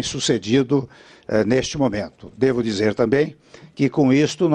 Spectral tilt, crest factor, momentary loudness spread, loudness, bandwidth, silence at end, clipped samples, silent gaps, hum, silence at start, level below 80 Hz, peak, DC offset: -5.5 dB/octave; 18 dB; 9 LU; -20 LUFS; 10 kHz; 0 s; under 0.1%; none; none; 0 s; -50 dBFS; -2 dBFS; under 0.1%